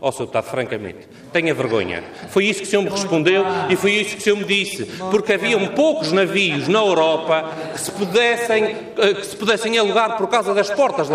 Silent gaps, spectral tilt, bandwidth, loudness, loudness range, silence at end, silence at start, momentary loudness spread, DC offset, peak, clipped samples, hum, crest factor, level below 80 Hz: none; -4 dB/octave; 15.5 kHz; -18 LUFS; 2 LU; 0 s; 0 s; 8 LU; under 0.1%; -4 dBFS; under 0.1%; none; 14 dB; -62 dBFS